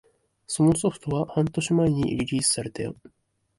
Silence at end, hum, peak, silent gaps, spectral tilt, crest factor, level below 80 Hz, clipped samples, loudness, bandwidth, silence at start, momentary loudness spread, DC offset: 0.65 s; none; -8 dBFS; none; -5 dB/octave; 16 dB; -52 dBFS; under 0.1%; -25 LUFS; 11.5 kHz; 0.5 s; 11 LU; under 0.1%